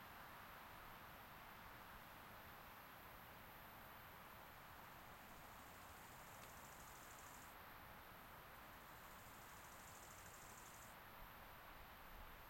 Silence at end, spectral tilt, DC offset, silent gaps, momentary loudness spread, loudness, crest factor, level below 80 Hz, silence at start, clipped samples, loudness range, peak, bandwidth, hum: 0 s; -3 dB/octave; under 0.1%; none; 1 LU; -59 LUFS; 18 dB; -70 dBFS; 0 s; under 0.1%; 0 LU; -42 dBFS; 16.5 kHz; none